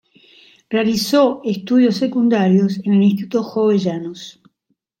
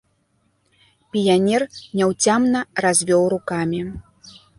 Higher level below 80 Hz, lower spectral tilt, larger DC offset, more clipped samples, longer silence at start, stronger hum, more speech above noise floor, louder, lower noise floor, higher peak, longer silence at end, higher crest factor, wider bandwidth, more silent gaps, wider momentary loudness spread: second, -62 dBFS vs -52 dBFS; first, -6.5 dB/octave vs -4 dB/octave; neither; neither; second, 0.7 s vs 1.15 s; neither; first, 54 dB vs 46 dB; about the same, -17 LUFS vs -19 LUFS; first, -70 dBFS vs -65 dBFS; about the same, -2 dBFS vs -4 dBFS; first, 0.7 s vs 0.3 s; about the same, 14 dB vs 16 dB; first, 16.5 kHz vs 11.5 kHz; neither; about the same, 10 LU vs 11 LU